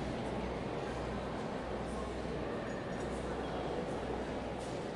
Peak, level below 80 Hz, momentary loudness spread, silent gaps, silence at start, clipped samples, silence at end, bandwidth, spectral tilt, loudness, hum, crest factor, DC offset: -26 dBFS; -50 dBFS; 2 LU; none; 0 s; under 0.1%; 0 s; 11.5 kHz; -6 dB/octave; -40 LUFS; none; 12 dB; under 0.1%